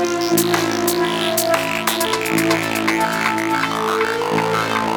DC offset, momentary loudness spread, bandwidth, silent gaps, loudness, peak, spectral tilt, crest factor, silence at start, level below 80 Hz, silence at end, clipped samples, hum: under 0.1%; 2 LU; 17.5 kHz; none; -18 LUFS; -2 dBFS; -3.5 dB/octave; 16 dB; 0 s; -54 dBFS; 0 s; under 0.1%; none